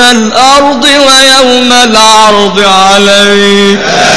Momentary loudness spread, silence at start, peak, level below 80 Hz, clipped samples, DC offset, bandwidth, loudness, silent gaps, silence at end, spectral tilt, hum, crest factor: 4 LU; 0 s; 0 dBFS; -36 dBFS; 10%; 7%; 11 kHz; -2 LUFS; none; 0 s; -2 dB/octave; none; 4 dB